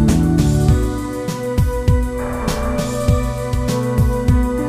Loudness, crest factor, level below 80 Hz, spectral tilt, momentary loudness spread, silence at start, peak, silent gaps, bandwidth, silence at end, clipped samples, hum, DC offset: -18 LUFS; 14 dB; -22 dBFS; -7 dB/octave; 7 LU; 0 s; -2 dBFS; none; 15.5 kHz; 0 s; under 0.1%; none; under 0.1%